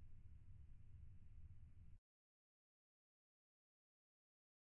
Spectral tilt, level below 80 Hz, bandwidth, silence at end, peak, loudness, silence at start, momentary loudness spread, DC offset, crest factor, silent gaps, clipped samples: -10 dB/octave; -66 dBFS; 3 kHz; 2.6 s; -50 dBFS; -66 LUFS; 0 s; 2 LU; under 0.1%; 14 dB; none; under 0.1%